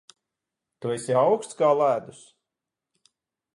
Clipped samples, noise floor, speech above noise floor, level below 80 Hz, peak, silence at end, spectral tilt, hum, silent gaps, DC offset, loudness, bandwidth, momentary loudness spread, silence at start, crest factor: under 0.1%; -87 dBFS; 64 dB; -76 dBFS; -8 dBFS; 1.45 s; -5.5 dB/octave; none; none; under 0.1%; -24 LUFS; 11.5 kHz; 10 LU; 0.8 s; 18 dB